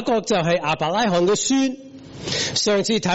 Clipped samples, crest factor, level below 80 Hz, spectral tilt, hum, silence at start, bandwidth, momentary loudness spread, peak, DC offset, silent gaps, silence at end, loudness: under 0.1%; 12 dB; -52 dBFS; -3.5 dB/octave; none; 0 s; 8.2 kHz; 10 LU; -8 dBFS; under 0.1%; none; 0 s; -20 LUFS